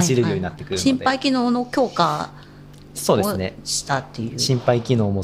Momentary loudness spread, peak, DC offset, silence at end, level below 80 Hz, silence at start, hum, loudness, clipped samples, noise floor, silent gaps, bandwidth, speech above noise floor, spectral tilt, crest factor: 7 LU; -2 dBFS; under 0.1%; 0 s; -52 dBFS; 0 s; none; -21 LUFS; under 0.1%; -42 dBFS; none; 16 kHz; 22 dB; -5 dB/octave; 20 dB